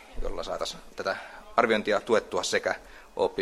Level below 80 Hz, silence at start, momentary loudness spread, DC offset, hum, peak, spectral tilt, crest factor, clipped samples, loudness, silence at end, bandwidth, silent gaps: -44 dBFS; 0 s; 12 LU; under 0.1%; none; -4 dBFS; -3 dB/octave; 24 dB; under 0.1%; -29 LUFS; 0 s; 14 kHz; none